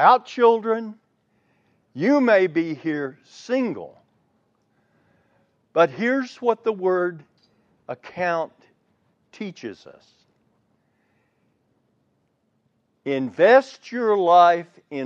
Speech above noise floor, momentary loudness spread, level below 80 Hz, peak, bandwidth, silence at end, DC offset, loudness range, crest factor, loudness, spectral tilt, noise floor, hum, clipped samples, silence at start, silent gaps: 49 dB; 20 LU; -78 dBFS; -2 dBFS; 7.6 kHz; 0 s; under 0.1%; 18 LU; 22 dB; -21 LUFS; -6 dB/octave; -69 dBFS; none; under 0.1%; 0 s; none